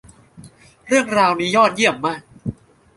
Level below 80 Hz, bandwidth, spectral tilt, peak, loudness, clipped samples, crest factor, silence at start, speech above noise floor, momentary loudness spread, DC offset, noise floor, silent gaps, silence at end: -54 dBFS; 11.5 kHz; -4 dB/octave; -2 dBFS; -17 LUFS; under 0.1%; 18 dB; 0.4 s; 28 dB; 16 LU; under 0.1%; -44 dBFS; none; 0.45 s